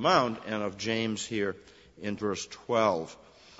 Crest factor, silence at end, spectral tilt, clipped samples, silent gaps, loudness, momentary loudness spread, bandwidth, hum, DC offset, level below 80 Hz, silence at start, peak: 22 dB; 0.45 s; -4.5 dB/octave; under 0.1%; none; -30 LUFS; 12 LU; 8 kHz; none; under 0.1%; -66 dBFS; 0 s; -8 dBFS